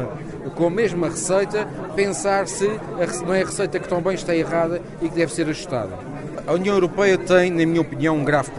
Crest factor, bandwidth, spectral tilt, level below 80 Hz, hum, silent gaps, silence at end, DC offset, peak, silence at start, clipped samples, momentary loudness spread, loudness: 18 dB; 11.5 kHz; -5 dB/octave; -46 dBFS; none; none; 0 s; under 0.1%; -2 dBFS; 0 s; under 0.1%; 9 LU; -21 LUFS